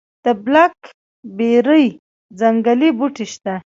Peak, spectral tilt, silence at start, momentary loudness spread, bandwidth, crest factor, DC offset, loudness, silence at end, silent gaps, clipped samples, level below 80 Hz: 0 dBFS; -5.5 dB/octave; 0.25 s; 12 LU; 7.6 kHz; 16 dB; under 0.1%; -16 LUFS; 0.15 s; 0.94-1.23 s, 1.99-2.29 s; under 0.1%; -64 dBFS